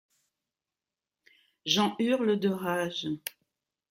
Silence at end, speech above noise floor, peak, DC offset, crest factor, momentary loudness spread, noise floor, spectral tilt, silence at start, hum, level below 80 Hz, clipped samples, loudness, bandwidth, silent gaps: 0.6 s; over 62 dB; -10 dBFS; under 0.1%; 22 dB; 11 LU; under -90 dBFS; -4.5 dB/octave; 1.65 s; none; -76 dBFS; under 0.1%; -29 LUFS; 16 kHz; none